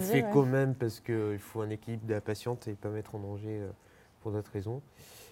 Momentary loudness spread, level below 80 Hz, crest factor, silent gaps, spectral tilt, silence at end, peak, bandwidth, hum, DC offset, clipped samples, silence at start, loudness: 17 LU; -68 dBFS; 22 dB; none; -7 dB/octave; 0 s; -12 dBFS; 17 kHz; none; under 0.1%; under 0.1%; 0 s; -34 LUFS